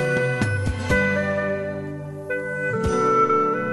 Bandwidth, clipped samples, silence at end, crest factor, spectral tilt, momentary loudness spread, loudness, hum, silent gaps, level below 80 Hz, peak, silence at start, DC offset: 12.5 kHz; under 0.1%; 0 s; 16 dB; -6.5 dB/octave; 11 LU; -22 LUFS; none; none; -40 dBFS; -8 dBFS; 0 s; under 0.1%